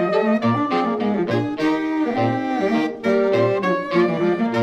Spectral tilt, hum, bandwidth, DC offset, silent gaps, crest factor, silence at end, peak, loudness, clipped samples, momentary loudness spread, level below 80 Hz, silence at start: -7.5 dB/octave; none; 8.8 kHz; under 0.1%; none; 12 dB; 0 s; -6 dBFS; -20 LUFS; under 0.1%; 3 LU; -56 dBFS; 0 s